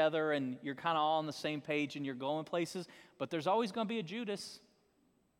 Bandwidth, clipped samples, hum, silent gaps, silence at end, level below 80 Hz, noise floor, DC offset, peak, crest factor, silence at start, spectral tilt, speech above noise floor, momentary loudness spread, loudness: 16.5 kHz; under 0.1%; none; none; 0.8 s; -84 dBFS; -74 dBFS; under 0.1%; -18 dBFS; 18 dB; 0 s; -5 dB/octave; 37 dB; 11 LU; -37 LUFS